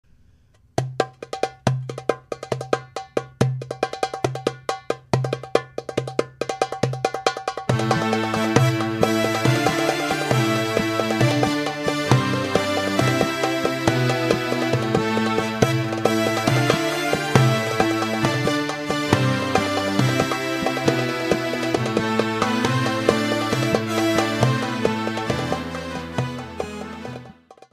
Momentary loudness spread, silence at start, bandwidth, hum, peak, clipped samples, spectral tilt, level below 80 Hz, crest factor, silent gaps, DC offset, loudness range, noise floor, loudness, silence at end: 9 LU; 0.8 s; 15.5 kHz; none; 0 dBFS; under 0.1%; -5.5 dB/octave; -52 dBFS; 22 dB; none; under 0.1%; 6 LU; -56 dBFS; -22 LUFS; 0.4 s